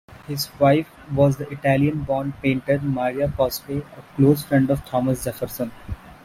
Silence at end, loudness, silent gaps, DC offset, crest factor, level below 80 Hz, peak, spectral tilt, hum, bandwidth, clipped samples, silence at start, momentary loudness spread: 0.1 s; -22 LUFS; none; under 0.1%; 18 dB; -44 dBFS; -4 dBFS; -6.5 dB/octave; none; 16 kHz; under 0.1%; 0.1 s; 12 LU